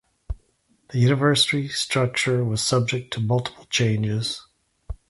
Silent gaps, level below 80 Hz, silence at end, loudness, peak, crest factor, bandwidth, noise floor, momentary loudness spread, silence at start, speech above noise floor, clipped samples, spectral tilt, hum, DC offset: none; -44 dBFS; 0.15 s; -22 LUFS; -4 dBFS; 18 dB; 11.5 kHz; -64 dBFS; 19 LU; 0.3 s; 43 dB; under 0.1%; -4.5 dB/octave; none; under 0.1%